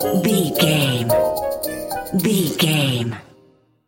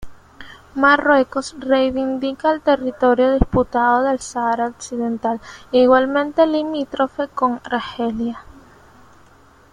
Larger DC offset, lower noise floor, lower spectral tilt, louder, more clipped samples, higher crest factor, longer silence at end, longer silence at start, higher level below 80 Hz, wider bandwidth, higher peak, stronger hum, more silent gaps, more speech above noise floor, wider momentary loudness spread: neither; first, -55 dBFS vs -49 dBFS; about the same, -5 dB/octave vs -5.5 dB/octave; about the same, -19 LUFS vs -18 LUFS; neither; about the same, 18 dB vs 18 dB; second, 0.65 s vs 1.3 s; about the same, 0 s vs 0 s; second, -50 dBFS vs -36 dBFS; first, 17 kHz vs 10.5 kHz; about the same, -2 dBFS vs 0 dBFS; neither; neither; first, 37 dB vs 32 dB; about the same, 9 LU vs 10 LU